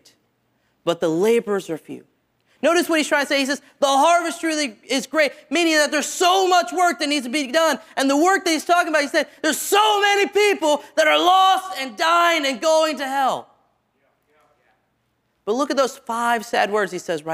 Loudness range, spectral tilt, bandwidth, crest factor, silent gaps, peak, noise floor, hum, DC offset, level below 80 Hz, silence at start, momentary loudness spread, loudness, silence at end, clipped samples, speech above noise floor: 7 LU; -2 dB/octave; 16 kHz; 16 dB; none; -4 dBFS; -69 dBFS; none; under 0.1%; -72 dBFS; 0.85 s; 9 LU; -19 LUFS; 0 s; under 0.1%; 50 dB